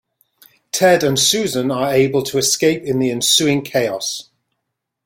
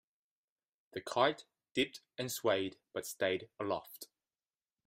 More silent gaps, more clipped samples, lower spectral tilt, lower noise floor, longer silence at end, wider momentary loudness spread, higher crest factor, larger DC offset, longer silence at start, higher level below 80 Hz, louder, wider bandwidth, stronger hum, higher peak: neither; neither; about the same, -3 dB/octave vs -3.5 dB/octave; second, -77 dBFS vs under -90 dBFS; about the same, 0.85 s vs 0.8 s; second, 8 LU vs 16 LU; second, 16 dB vs 24 dB; neither; second, 0.75 s vs 0.95 s; first, -56 dBFS vs -78 dBFS; first, -16 LUFS vs -37 LUFS; about the same, 16.5 kHz vs 16 kHz; neither; first, -2 dBFS vs -16 dBFS